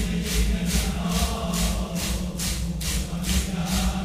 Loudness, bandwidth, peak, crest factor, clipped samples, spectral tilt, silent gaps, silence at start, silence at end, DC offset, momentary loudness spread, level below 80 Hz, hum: -26 LUFS; 16 kHz; -10 dBFS; 16 dB; under 0.1%; -4 dB/octave; none; 0 s; 0 s; under 0.1%; 3 LU; -28 dBFS; none